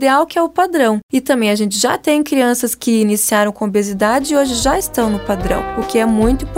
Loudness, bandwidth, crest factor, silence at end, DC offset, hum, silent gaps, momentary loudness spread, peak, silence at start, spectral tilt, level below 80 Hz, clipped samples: -15 LUFS; 16.5 kHz; 14 dB; 0 s; under 0.1%; none; 1.03-1.09 s; 4 LU; -2 dBFS; 0 s; -4 dB/octave; -32 dBFS; under 0.1%